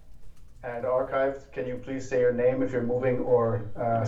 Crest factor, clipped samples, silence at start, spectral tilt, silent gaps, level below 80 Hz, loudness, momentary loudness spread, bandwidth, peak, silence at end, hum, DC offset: 14 dB; under 0.1%; 0 s; -8 dB/octave; none; -50 dBFS; -27 LUFS; 11 LU; 7.8 kHz; -12 dBFS; 0 s; none; under 0.1%